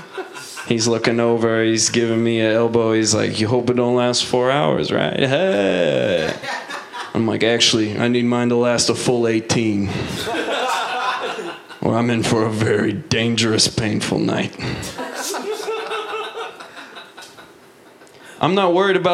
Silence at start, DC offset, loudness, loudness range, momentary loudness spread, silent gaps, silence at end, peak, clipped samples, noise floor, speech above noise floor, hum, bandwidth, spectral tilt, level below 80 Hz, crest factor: 0 s; under 0.1%; -18 LUFS; 8 LU; 12 LU; none; 0 s; 0 dBFS; under 0.1%; -46 dBFS; 29 dB; none; 15.5 kHz; -4 dB/octave; -52 dBFS; 18 dB